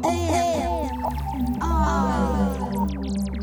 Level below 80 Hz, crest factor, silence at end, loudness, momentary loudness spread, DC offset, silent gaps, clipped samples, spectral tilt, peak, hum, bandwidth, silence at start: -30 dBFS; 14 dB; 0 s; -24 LUFS; 5 LU; under 0.1%; none; under 0.1%; -6.5 dB/octave; -10 dBFS; none; over 20 kHz; 0 s